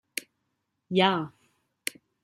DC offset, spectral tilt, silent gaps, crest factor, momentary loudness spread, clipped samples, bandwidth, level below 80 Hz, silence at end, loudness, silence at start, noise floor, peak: under 0.1%; -4 dB/octave; none; 24 dB; 14 LU; under 0.1%; 16 kHz; -76 dBFS; 0.95 s; -28 LUFS; 0.15 s; -79 dBFS; -6 dBFS